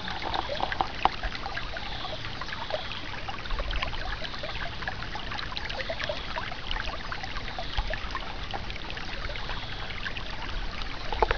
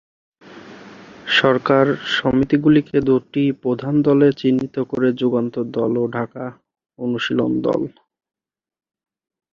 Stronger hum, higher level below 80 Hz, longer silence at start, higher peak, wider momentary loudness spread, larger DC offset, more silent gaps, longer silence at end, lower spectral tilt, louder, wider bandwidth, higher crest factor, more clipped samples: neither; first, -38 dBFS vs -52 dBFS; second, 0 s vs 0.5 s; second, -6 dBFS vs -2 dBFS; second, 6 LU vs 11 LU; first, 1% vs under 0.1%; neither; second, 0 s vs 1.65 s; second, -4.5 dB/octave vs -7 dB/octave; second, -33 LUFS vs -18 LUFS; second, 5.4 kHz vs 7.2 kHz; first, 28 dB vs 18 dB; neither